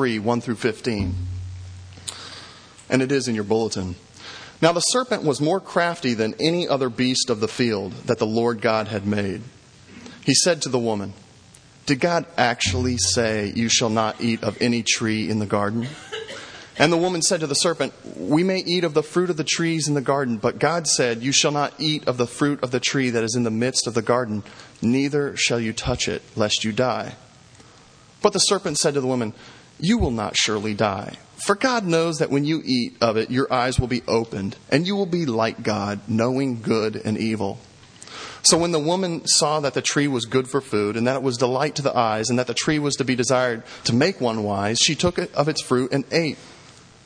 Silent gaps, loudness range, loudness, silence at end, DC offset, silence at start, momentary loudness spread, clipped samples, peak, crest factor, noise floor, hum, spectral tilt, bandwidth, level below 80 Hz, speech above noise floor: none; 3 LU; -21 LUFS; 0.35 s; under 0.1%; 0 s; 11 LU; under 0.1%; 0 dBFS; 22 dB; -50 dBFS; none; -4 dB/octave; 10.5 kHz; -48 dBFS; 28 dB